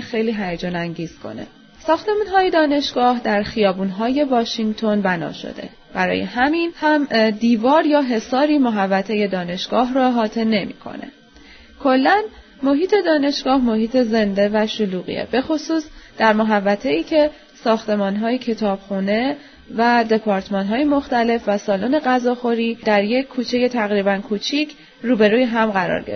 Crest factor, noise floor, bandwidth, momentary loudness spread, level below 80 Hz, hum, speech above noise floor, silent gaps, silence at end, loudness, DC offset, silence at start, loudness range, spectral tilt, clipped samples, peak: 18 dB; -45 dBFS; 6.6 kHz; 9 LU; -50 dBFS; none; 27 dB; none; 0 s; -19 LUFS; under 0.1%; 0 s; 3 LU; -6 dB/octave; under 0.1%; -2 dBFS